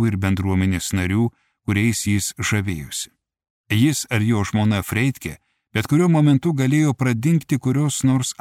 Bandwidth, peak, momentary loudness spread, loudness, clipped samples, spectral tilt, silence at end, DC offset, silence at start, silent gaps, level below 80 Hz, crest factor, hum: 16.5 kHz; -4 dBFS; 9 LU; -20 LUFS; under 0.1%; -5.5 dB/octave; 0.1 s; under 0.1%; 0 s; 3.50-3.64 s; -48 dBFS; 14 dB; none